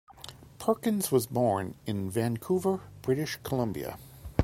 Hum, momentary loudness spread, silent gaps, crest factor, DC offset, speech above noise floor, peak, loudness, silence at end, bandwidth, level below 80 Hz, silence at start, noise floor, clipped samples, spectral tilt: none; 13 LU; none; 22 dB; under 0.1%; 19 dB; -8 dBFS; -30 LUFS; 0 s; 16.5 kHz; -56 dBFS; 0.1 s; -49 dBFS; under 0.1%; -6 dB/octave